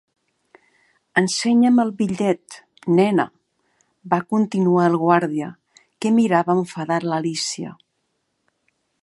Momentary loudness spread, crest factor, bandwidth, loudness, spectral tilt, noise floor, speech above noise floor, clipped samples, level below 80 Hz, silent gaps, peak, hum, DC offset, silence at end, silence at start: 11 LU; 20 dB; 11.5 kHz; -20 LUFS; -5.5 dB/octave; -72 dBFS; 54 dB; under 0.1%; -68 dBFS; none; -2 dBFS; none; under 0.1%; 1.3 s; 1.15 s